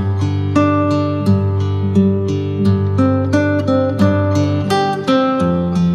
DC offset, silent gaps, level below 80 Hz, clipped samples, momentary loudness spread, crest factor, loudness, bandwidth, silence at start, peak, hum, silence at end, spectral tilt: under 0.1%; none; -50 dBFS; under 0.1%; 3 LU; 14 dB; -15 LUFS; 10.5 kHz; 0 s; 0 dBFS; none; 0 s; -8 dB/octave